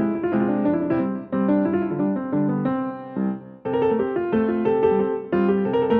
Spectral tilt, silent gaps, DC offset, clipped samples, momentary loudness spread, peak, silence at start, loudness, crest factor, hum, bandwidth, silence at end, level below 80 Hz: -11 dB/octave; none; under 0.1%; under 0.1%; 7 LU; -8 dBFS; 0 s; -22 LUFS; 14 dB; none; 4.2 kHz; 0 s; -56 dBFS